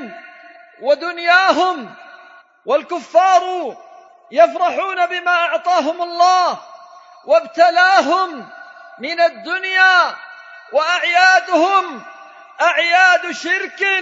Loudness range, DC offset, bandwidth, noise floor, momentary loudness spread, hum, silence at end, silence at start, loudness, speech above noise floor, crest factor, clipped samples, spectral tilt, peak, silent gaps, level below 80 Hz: 3 LU; under 0.1%; 7.8 kHz; -45 dBFS; 17 LU; none; 0 s; 0 s; -15 LUFS; 30 dB; 16 dB; under 0.1%; -1 dB/octave; 0 dBFS; none; -82 dBFS